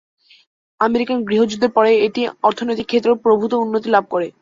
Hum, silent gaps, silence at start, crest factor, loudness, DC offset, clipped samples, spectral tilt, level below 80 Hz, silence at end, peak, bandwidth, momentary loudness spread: none; none; 0.8 s; 16 dB; -17 LUFS; under 0.1%; under 0.1%; -5.5 dB/octave; -60 dBFS; 0.1 s; -2 dBFS; 7.6 kHz; 5 LU